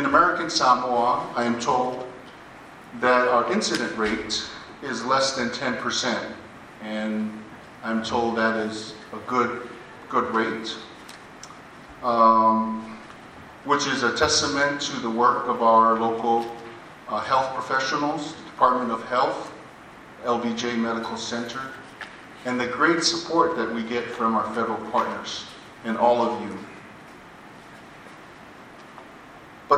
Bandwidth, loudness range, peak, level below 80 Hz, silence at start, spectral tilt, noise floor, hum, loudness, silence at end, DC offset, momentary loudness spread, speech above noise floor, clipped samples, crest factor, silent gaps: 13 kHz; 7 LU; -4 dBFS; -60 dBFS; 0 s; -3.5 dB/octave; -45 dBFS; none; -23 LUFS; 0 s; under 0.1%; 24 LU; 22 dB; under 0.1%; 20 dB; none